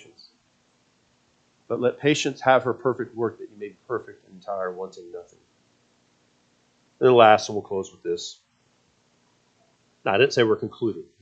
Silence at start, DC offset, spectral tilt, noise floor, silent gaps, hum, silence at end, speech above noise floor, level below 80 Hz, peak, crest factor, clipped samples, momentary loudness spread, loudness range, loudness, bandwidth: 1.7 s; under 0.1%; -5 dB/octave; -65 dBFS; none; none; 0.2 s; 43 dB; -72 dBFS; -2 dBFS; 24 dB; under 0.1%; 21 LU; 11 LU; -23 LUFS; 8.6 kHz